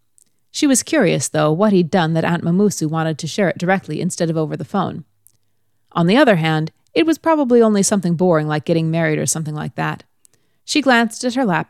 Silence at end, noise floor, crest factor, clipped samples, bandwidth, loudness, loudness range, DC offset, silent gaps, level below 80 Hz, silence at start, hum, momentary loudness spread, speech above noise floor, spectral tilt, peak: 0.05 s; -70 dBFS; 16 dB; under 0.1%; 15 kHz; -17 LUFS; 4 LU; under 0.1%; none; -62 dBFS; 0.55 s; none; 10 LU; 54 dB; -5 dB/octave; -2 dBFS